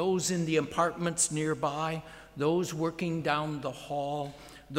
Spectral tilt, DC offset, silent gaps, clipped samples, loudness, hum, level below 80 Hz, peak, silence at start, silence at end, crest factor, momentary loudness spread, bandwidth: -4.5 dB/octave; under 0.1%; none; under 0.1%; -31 LUFS; none; -62 dBFS; -12 dBFS; 0 s; 0 s; 18 dB; 9 LU; 16 kHz